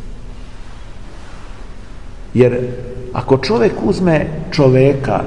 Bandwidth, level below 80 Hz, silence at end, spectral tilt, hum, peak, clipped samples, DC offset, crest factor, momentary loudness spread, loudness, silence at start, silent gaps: 10.5 kHz; -32 dBFS; 0 s; -7.5 dB/octave; none; 0 dBFS; under 0.1%; 2%; 16 dB; 24 LU; -14 LUFS; 0 s; none